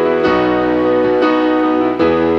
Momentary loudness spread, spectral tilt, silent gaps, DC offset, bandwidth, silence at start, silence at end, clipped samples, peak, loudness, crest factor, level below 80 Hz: 1 LU; -7.5 dB/octave; none; under 0.1%; 6.4 kHz; 0 s; 0 s; under 0.1%; -2 dBFS; -13 LUFS; 10 dB; -42 dBFS